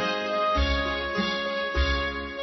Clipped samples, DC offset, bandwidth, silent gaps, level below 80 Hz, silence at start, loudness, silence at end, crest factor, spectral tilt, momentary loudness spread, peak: under 0.1%; under 0.1%; 6.2 kHz; none; -32 dBFS; 0 s; -26 LUFS; 0 s; 14 dB; -5.5 dB/octave; 3 LU; -12 dBFS